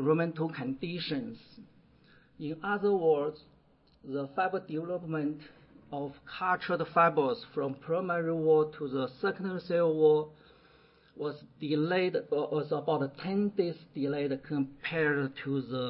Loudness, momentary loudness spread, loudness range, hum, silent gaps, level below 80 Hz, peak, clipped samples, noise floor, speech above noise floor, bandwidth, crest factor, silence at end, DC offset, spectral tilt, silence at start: -31 LUFS; 13 LU; 4 LU; none; none; -70 dBFS; -12 dBFS; under 0.1%; -64 dBFS; 33 dB; 5.6 kHz; 20 dB; 0 s; under 0.1%; -10.5 dB/octave; 0 s